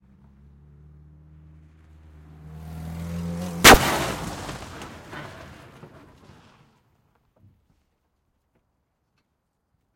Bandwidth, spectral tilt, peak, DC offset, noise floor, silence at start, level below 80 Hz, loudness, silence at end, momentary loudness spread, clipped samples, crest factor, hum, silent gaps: 16.5 kHz; -2.5 dB/octave; 0 dBFS; under 0.1%; -75 dBFS; 2.45 s; -40 dBFS; -18 LUFS; 4.4 s; 29 LU; under 0.1%; 26 dB; none; none